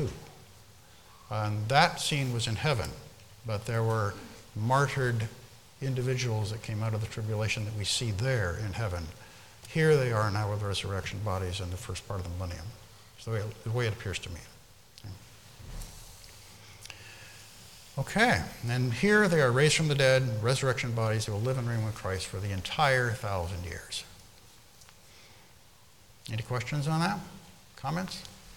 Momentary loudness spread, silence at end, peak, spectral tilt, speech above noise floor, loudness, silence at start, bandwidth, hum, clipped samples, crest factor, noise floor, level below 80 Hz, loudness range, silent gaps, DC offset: 23 LU; 0 s; -6 dBFS; -5 dB/octave; 29 dB; -30 LUFS; 0 s; 18 kHz; none; under 0.1%; 24 dB; -58 dBFS; -54 dBFS; 13 LU; none; 0.1%